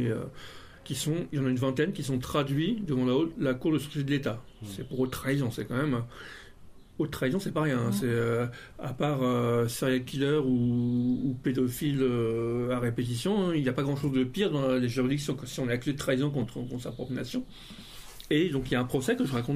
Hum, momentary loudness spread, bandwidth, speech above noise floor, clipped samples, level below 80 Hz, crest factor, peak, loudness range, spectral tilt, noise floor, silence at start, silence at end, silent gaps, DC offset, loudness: none; 12 LU; 15.5 kHz; 20 dB; under 0.1%; -54 dBFS; 16 dB; -14 dBFS; 4 LU; -6.5 dB/octave; -49 dBFS; 0 s; 0 s; none; under 0.1%; -29 LUFS